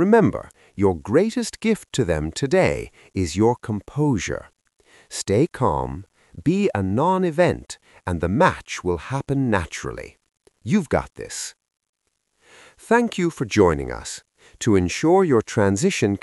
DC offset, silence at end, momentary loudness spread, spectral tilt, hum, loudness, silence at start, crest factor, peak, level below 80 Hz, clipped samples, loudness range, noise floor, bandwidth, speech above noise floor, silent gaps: under 0.1%; 0.05 s; 14 LU; -6 dB/octave; none; -21 LUFS; 0 s; 20 dB; -2 dBFS; -44 dBFS; under 0.1%; 5 LU; -71 dBFS; 12 kHz; 50 dB; 11.89-11.93 s